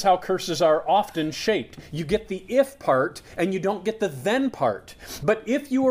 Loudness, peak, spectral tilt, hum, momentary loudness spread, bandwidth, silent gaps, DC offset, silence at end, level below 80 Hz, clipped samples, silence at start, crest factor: -24 LUFS; -6 dBFS; -5 dB/octave; none; 7 LU; 15.5 kHz; none; under 0.1%; 0 s; -52 dBFS; under 0.1%; 0 s; 16 dB